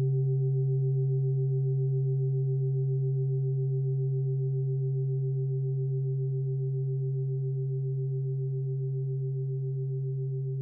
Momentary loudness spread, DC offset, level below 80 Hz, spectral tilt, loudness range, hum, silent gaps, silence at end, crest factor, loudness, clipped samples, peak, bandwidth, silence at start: 4 LU; under 0.1%; -70 dBFS; -15.5 dB/octave; 3 LU; none; none; 0 s; 8 dB; -30 LUFS; under 0.1%; -20 dBFS; 0.8 kHz; 0 s